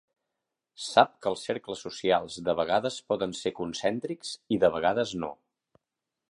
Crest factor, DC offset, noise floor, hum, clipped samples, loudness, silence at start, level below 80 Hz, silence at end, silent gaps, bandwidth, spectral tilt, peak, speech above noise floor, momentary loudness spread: 24 dB; under 0.1%; -87 dBFS; none; under 0.1%; -28 LUFS; 0.8 s; -64 dBFS; 0.95 s; none; 11.5 kHz; -4 dB/octave; -4 dBFS; 59 dB; 12 LU